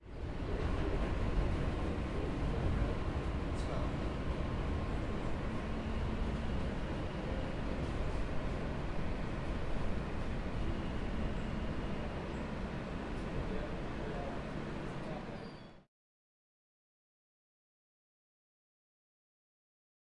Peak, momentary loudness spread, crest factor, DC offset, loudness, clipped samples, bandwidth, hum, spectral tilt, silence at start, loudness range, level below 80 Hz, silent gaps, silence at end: -22 dBFS; 5 LU; 14 dB; under 0.1%; -39 LUFS; under 0.1%; 11 kHz; none; -7.5 dB/octave; 0 s; 7 LU; -42 dBFS; none; 4.25 s